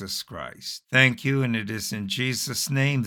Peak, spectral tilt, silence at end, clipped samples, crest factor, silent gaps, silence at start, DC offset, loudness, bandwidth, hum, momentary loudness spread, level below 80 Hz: -4 dBFS; -4 dB/octave; 0 s; under 0.1%; 22 dB; none; 0 s; under 0.1%; -24 LUFS; 19 kHz; none; 15 LU; -62 dBFS